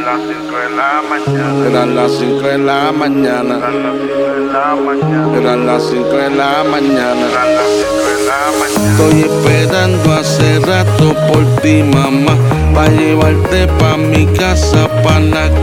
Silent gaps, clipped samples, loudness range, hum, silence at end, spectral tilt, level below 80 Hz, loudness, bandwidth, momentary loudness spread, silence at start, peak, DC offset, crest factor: none; under 0.1%; 3 LU; none; 0 s; -6 dB/octave; -24 dBFS; -11 LUFS; 18 kHz; 5 LU; 0 s; 0 dBFS; under 0.1%; 10 dB